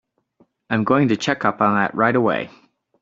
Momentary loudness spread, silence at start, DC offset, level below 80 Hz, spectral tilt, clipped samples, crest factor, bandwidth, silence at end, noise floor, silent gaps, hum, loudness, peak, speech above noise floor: 7 LU; 0.7 s; under 0.1%; -60 dBFS; -4.5 dB/octave; under 0.1%; 18 dB; 7.8 kHz; 0.55 s; -60 dBFS; none; none; -19 LUFS; -2 dBFS; 42 dB